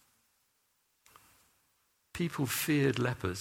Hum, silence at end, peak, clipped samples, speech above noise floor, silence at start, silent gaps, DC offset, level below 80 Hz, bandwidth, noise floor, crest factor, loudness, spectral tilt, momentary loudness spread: none; 0 s; -16 dBFS; under 0.1%; 45 dB; 2.15 s; none; under 0.1%; -64 dBFS; 17.5 kHz; -76 dBFS; 20 dB; -32 LUFS; -5 dB/octave; 9 LU